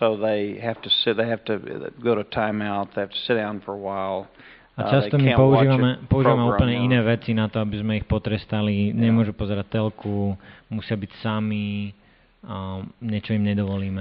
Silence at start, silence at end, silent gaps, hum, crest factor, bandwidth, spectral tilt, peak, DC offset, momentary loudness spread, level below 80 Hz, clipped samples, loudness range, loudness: 0 s; 0 s; none; none; 20 dB; 5.2 kHz; -5.5 dB/octave; -4 dBFS; under 0.1%; 13 LU; -44 dBFS; under 0.1%; 8 LU; -23 LUFS